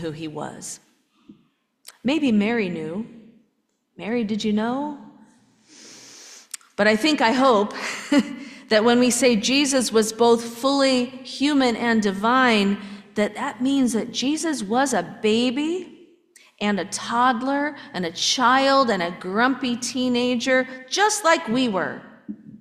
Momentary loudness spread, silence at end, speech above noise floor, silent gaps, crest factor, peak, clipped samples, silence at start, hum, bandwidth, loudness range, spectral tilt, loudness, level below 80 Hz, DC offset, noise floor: 15 LU; 0.05 s; 50 dB; none; 18 dB; -4 dBFS; under 0.1%; 0 s; none; 15 kHz; 7 LU; -3.5 dB/octave; -21 LUFS; -64 dBFS; under 0.1%; -70 dBFS